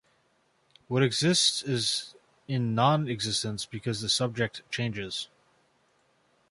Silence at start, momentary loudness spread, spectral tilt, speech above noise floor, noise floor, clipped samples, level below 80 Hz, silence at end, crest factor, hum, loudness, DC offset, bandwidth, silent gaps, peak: 0.9 s; 11 LU; -4 dB/octave; 41 dB; -69 dBFS; under 0.1%; -64 dBFS; 1.25 s; 22 dB; none; -28 LUFS; under 0.1%; 11.5 kHz; none; -8 dBFS